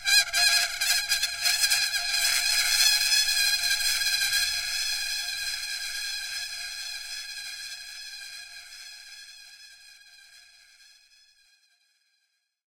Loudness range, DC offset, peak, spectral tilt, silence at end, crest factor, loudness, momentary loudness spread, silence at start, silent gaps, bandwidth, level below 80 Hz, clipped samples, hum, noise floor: 20 LU; under 0.1%; -8 dBFS; 4 dB/octave; 2.3 s; 20 dB; -24 LUFS; 21 LU; 0 s; none; 16 kHz; -56 dBFS; under 0.1%; none; -75 dBFS